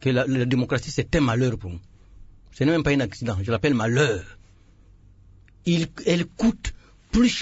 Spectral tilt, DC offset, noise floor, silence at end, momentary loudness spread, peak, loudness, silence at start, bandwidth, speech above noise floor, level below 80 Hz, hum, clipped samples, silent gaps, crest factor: -6 dB/octave; under 0.1%; -52 dBFS; 0 s; 11 LU; -8 dBFS; -23 LUFS; 0 s; 8 kHz; 30 dB; -42 dBFS; none; under 0.1%; none; 16 dB